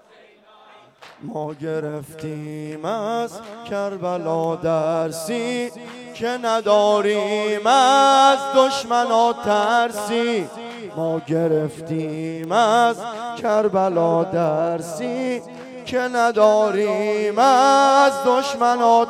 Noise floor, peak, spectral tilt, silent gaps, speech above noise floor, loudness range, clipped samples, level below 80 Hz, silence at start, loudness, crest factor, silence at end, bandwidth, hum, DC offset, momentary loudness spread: -50 dBFS; -2 dBFS; -4.5 dB/octave; none; 31 dB; 9 LU; under 0.1%; -64 dBFS; 1 s; -19 LUFS; 18 dB; 0 s; 15.5 kHz; none; under 0.1%; 16 LU